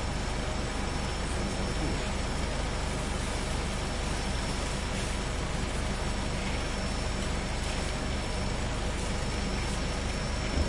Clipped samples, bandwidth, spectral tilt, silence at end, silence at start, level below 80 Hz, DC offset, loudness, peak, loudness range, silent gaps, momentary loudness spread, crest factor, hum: under 0.1%; 11.5 kHz; -4.5 dB/octave; 0 s; 0 s; -34 dBFS; under 0.1%; -32 LUFS; -18 dBFS; 0 LU; none; 1 LU; 14 dB; none